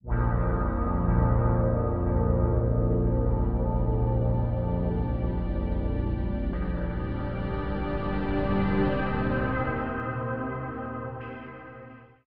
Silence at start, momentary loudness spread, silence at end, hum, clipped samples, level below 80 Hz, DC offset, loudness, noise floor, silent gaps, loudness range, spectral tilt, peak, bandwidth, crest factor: 0 s; 10 LU; 0.05 s; none; under 0.1%; -32 dBFS; under 0.1%; -28 LUFS; -47 dBFS; none; 5 LU; -11.5 dB/octave; -12 dBFS; 4.6 kHz; 14 dB